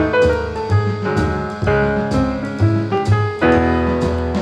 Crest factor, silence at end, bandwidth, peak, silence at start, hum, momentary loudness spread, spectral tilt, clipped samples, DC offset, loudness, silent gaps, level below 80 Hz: 14 dB; 0 s; 9.8 kHz; -2 dBFS; 0 s; none; 4 LU; -7.5 dB/octave; under 0.1%; under 0.1%; -17 LUFS; none; -30 dBFS